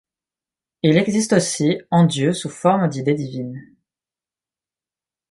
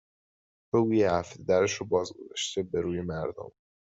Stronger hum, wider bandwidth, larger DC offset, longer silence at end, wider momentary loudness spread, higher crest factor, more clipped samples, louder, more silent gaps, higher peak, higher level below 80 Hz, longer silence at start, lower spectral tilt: neither; first, 11.5 kHz vs 8 kHz; neither; first, 1.65 s vs 0.5 s; about the same, 12 LU vs 12 LU; about the same, 18 dB vs 18 dB; neither; first, -19 LUFS vs -29 LUFS; neither; first, -2 dBFS vs -12 dBFS; about the same, -62 dBFS vs -62 dBFS; about the same, 0.85 s vs 0.75 s; about the same, -5.5 dB/octave vs -5 dB/octave